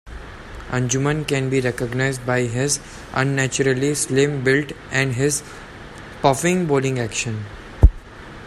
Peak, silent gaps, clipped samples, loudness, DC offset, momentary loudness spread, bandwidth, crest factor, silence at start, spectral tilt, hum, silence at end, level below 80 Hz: 0 dBFS; none; under 0.1%; -20 LUFS; under 0.1%; 19 LU; 14.5 kHz; 20 dB; 0.05 s; -4.5 dB/octave; none; 0 s; -28 dBFS